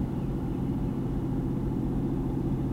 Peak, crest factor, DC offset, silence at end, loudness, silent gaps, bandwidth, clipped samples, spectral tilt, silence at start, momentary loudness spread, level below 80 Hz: -18 dBFS; 12 dB; under 0.1%; 0 s; -30 LUFS; none; 12.5 kHz; under 0.1%; -10 dB/octave; 0 s; 1 LU; -38 dBFS